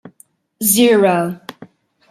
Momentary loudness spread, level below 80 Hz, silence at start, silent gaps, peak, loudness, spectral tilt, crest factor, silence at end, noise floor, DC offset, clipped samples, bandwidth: 20 LU; -62 dBFS; 0.05 s; none; 0 dBFS; -14 LUFS; -3.5 dB/octave; 16 dB; 0.45 s; -52 dBFS; under 0.1%; under 0.1%; 16 kHz